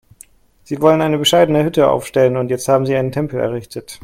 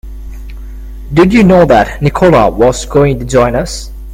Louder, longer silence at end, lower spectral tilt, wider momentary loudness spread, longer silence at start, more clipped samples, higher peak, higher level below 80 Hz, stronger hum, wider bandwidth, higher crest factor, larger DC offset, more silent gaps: second, -15 LUFS vs -9 LUFS; about the same, 0.1 s vs 0 s; about the same, -5.5 dB/octave vs -6.5 dB/octave; second, 9 LU vs 23 LU; first, 0.7 s vs 0.05 s; second, under 0.1% vs 0.4%; about the same, 0 dBFS vs 0 dBFS; second, -50 dBFS vs -24 dBFS; neither; about the same, 16.5 kHz vs 16 kHz; first, 16 dB vs 10 dB; neither; neither